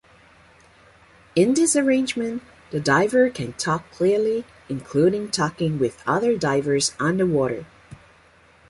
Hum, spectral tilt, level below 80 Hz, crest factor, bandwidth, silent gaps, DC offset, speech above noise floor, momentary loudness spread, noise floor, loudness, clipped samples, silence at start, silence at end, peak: none; -4.5 dB/octave; -56 dBFS; 16 dB; 11.5 kHz; none; under 0.1%; 33 dB; 10 LU; -54 dBFS; -21 LUFS; under 0.1%; 1.35 s; 0.75 s; -6 dBFS